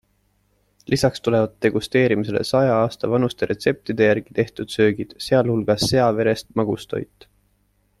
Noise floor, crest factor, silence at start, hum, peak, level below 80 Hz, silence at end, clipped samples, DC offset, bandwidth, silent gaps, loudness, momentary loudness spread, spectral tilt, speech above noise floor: -65 dBFS; 18 dB; 0.9 s; 50 Hz at -50 dBFS; -4 dBFS; -52 dBFS; 0.95 s; under 0.1%; under 0.1%; 14 kHz; none; -20 LUFS; 7 LU; -6 dB/octave; 45 dB